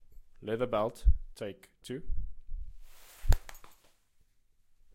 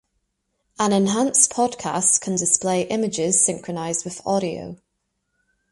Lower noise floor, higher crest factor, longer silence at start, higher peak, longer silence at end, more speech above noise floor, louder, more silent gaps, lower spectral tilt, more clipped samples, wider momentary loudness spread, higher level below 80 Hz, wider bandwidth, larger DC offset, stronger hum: second, -67 dBFS vs -75 dBFS; about the same, 22 dB vs 22 dB; second, 0.1 s vs 0.8 s; second, -10 dBFS vs 0 dBFS; first, 1.25 s vs 0.95 s; second, 36 dB vs 54 dB; second, -36 LUFS vs -20 LUFS; neither; first, -6.5 dB/octave vs -3.5 dB/octave; neither; first, 21 LU vs 10 LU; first, -36 dBFS vs -62 dBFS; first, 15.5 kHz vs 11.5 kHz; neither; neither